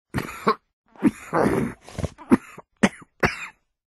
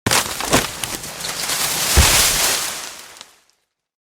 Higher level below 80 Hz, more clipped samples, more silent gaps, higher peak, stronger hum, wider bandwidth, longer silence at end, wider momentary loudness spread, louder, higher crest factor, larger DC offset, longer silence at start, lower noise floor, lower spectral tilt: second, -46 dBFS vs -30 dBFS; neither; first, 0.73-0.84 s vs none; about the same, -2 dBFS vs 0 dBFS; neither; second, 12.5 kHz vs over 20 kHz; second, 0.5 s vs 1 s; second, 11 LU vs 14 LU; second, -25 LUFS vs -16 LUFS; about the same, 24 dB vs 20 dB; neither; about the same, 0.15 s vs 0.05 s; second, -40 dBFS vs -65 dBFS; first, -6 dB/octave vs -1.5 dB/octave